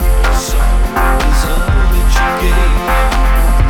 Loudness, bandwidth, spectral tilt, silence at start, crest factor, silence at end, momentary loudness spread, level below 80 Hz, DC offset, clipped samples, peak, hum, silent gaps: -14 LUFS; 16 kHz; -5 dB/octave; 0 s; 10 dB; 0 s; 2 LU; -10 dBFS; under 0.1%; under 0.1%; 0 dBFS; none; none